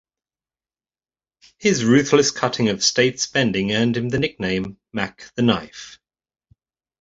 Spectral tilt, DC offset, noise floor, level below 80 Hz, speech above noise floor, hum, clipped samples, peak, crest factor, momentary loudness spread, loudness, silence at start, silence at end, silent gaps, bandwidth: -4 dB/octave; under 0.1%; under -90 dBFS; -54 dBFS; over 70 dB; none; under 0.1%; -2 dBFS; 20 dB; 12 LU; -20 LUFS; 1.6 s; 1.1 s; none; 8 kHz